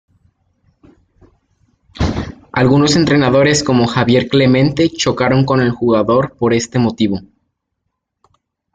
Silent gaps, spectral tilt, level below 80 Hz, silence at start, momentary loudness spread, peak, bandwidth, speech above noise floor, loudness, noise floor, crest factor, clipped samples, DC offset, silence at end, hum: none; -5.5 dB/octave; -38 dBFS; 1.95 s; 8 LU; 0 dBFS; 9.4 kHz; 61 dB; -13 LUFS; -73 dBFS; 14 dB; under 0.1%; under 0.1%; 1.5 s; none